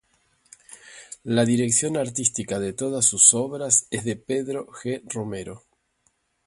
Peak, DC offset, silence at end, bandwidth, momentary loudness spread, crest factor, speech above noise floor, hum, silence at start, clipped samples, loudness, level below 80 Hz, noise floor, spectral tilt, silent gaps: 0 dBFS; under 0.1%; 0.9 s; 11.5 kHz; 18 LU; 24 dB; 46 dB; none; 0.7 s; under 0.1%; -21 LUFS; -60 dBFS; -69 dBFS; -3.5 dB/octave; none